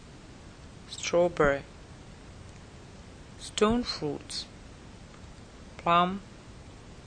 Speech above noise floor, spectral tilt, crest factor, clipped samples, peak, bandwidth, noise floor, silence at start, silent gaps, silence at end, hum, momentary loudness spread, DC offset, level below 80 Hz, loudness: 22 dB; -4.5 dB/octave; 22 dB; under 0.1%; -10 dBFS; 10 kHz; -48 dBFS; 0 s; none; 0 s; none; 24 LU; under 0.1%; -50 dBFS; -28 LUFS